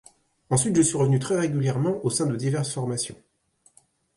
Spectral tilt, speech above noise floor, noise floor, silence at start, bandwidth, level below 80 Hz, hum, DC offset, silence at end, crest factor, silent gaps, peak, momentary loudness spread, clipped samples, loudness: -5.5 dB/octave; 40 dB; -64 dBFS; 0.5 s; 11.5 kHz; -60 dBFS; none; under 0.1%; 1.05 s; 16 dB; none; -8 dBFS; 7 LU; under 0.1%; -24 LUFS